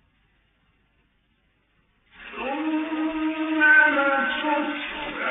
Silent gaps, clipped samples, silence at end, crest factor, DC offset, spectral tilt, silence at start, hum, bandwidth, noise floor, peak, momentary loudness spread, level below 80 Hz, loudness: none; under 0.1%; 0 s; 18 dB; under 0.1%; 0 dB/octave; 2.2 s; none; 4.1 kHz; -67 dBFS; -6 dBFS; 15 LU; -60 dBFS; -22 LUFS